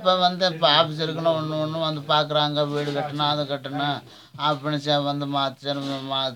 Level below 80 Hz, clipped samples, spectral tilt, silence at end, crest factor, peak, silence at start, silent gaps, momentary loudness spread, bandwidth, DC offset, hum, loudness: -74 dBFS; under 0.1%; -5.5 dB/octave; 0 s; 20 dB; -4 dBFS; 0 s; none; 8 LU; 17 kHz; under 0.1%; none; -23 LUFS